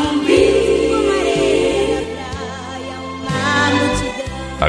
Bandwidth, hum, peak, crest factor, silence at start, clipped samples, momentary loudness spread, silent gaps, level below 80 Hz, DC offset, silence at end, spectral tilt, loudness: 11 kHz; none; 0 dBFS; 16 dB; 0 s; under 0.1%; 14 LU; none; -34 dBFS; under 0.1%; 0 s; -4.5 dB/octave; -16 LUFS